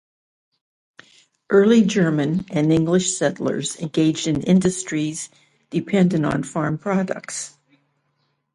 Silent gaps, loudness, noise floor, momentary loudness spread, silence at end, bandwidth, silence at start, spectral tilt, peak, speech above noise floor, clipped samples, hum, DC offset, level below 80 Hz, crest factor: none; -20 LUFS; -70 dBFS; 12 LU; 1.05 s; 11.5 kHz; 1.5 s; -5.5 dB/octave; -4 dBFS; 50 dB; under 0.1%; none; under 0.1%; -56 dBFS; 18 dB